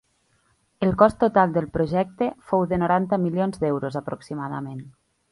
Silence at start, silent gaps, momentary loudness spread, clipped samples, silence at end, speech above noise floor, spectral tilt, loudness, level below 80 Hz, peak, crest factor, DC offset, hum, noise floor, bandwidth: 0.8 s; none; 13 LU; under 0.1%; 0.4 s; 43 dB; -8.5 dB/octave; -23 LUFS; -50 dBFS; -2 dBFS; 22 dB; under 0.1%; none; -66 dBFS; 11.5 kHz